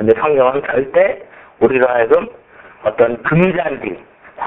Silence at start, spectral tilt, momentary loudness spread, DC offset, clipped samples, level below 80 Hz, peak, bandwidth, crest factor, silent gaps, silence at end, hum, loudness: 0 s; -9.5 dB/octave; 13 LU; under 0.1%; under 0.1%; -50 dBFS; 0 dBFS; 3.9 kHz; 16 dB; none; 0 s; none; -15 LUFS